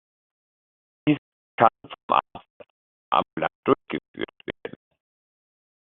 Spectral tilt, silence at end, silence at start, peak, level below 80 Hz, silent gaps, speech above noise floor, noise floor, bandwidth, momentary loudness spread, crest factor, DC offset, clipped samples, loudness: -4 dB/octave; 1.2 s; 1.05 s; -2 dBFS; -64 dBFS; 1.18-1.58 s, 2.03-2.09 s, 2.50-2.60 s, 2.70-3.12 s, 3.33-3.37 s, 3.55-3.63 s, 4.08-4.14 s; over 67 dB; under -90 dBFS; 4.1 kHz; 18 LU; 26 dB; under 0.1%; under 0.1%; -25 LUFS